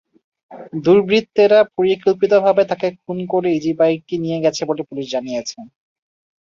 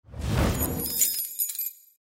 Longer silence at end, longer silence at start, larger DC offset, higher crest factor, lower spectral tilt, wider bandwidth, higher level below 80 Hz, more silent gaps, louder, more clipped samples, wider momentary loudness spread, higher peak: first, 0.8 s vs 0.4 s; first, 0.5 s vs 0.1 s; neither; about the same, 16 dB vs 20 dB; first, -5.5 dB/octave vs -3.5 dB/octave; second, 7.4 kHz vs 16.5 kHz; second, -62 dBFS vs -36 dBFS; neither; first, -17 LUFS vs -26 LUFS; neither; first, 11 LU vs 8 LU; first, -2 dBFS vs -8 dBFS